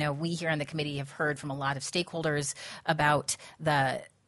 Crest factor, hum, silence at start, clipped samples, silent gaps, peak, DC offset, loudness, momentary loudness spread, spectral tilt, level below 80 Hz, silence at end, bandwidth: 20 dB; none; 0 s; under 0.1%; none; -10 dBFS; under 0.1%; -30 LUFS; 8 LU; -4 dB/octave; -64 dBFS; 0.2 s; 11.5 kHz